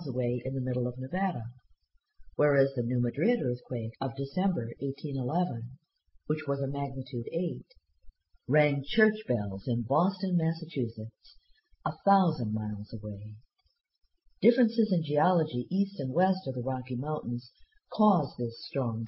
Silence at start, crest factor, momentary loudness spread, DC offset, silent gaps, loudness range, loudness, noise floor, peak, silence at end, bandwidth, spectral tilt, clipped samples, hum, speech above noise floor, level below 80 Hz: 0 s; 20 dB; 12 LU; under 0.1%; none; 4 LU; -30 LUFS; -66 dBFS; -10 dBFS; 0 s; 5.8 kHz; -11.5 dB/octave; under 0.1%; none; 37 dB; -62 dBFS